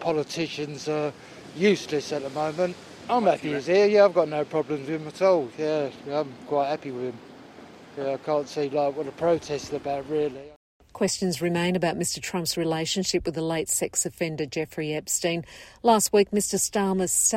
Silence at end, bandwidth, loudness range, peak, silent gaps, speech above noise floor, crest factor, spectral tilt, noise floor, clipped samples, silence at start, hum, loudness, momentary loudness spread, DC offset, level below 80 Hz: 0 s; 16 kHz; 6 LU; -6 dBFS; 10.56-10.80 s; 21 dB; 20 dB; -4 dB/octave; -46 dBFS; under 0.1%; 0 s; none; -25 LUFS; 10 LU; under 0.1%; -58 dBFS